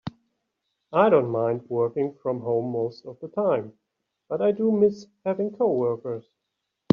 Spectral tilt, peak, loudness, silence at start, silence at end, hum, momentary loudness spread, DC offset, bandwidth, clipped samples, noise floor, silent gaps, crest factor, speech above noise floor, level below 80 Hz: -7 dB/octave; -4 dBFS; -25 LUFS; 0.05 s; 0.75 s; none; 13 LU; under 0.1%; 6.8 kHz; under 0.1%; -81 dBFS; none; 22 dB; 57 dB; -68 dBFS